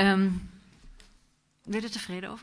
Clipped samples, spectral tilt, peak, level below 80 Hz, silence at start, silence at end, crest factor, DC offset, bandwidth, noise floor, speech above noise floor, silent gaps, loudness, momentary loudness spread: under 0.1%; -5.5 dB/octave; -10 dBFS; -54 dBFS; 0 s; 0 s; 20 dB; under 0.1%; 11 kHz; -66 dBFS; 39 dB; none; -30 LUFS; 21 LU